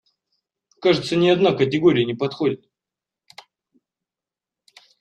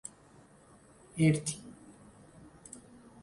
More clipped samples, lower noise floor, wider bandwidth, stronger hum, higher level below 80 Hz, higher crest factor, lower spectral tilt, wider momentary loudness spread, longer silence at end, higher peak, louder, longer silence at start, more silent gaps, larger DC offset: neither; first, -89 dBFS vs -59 dBFS; second, 9 kHz vs 11.5 kHz; neither; about the same, -62 dBFS vs -66 dBFS; about the same, 18 dB vs 22 dB; about the same, -6.5 dB/octave vs -5.5 dB/octave; second, 8 LU vs 28 LU; first, 2.45 s vs 1.5 s; first, -4 dBFS vs -16 dBFS; first, -19 LUFS vs -31 LUFS; second, 0.8 s vs 1.15 s; neither; neither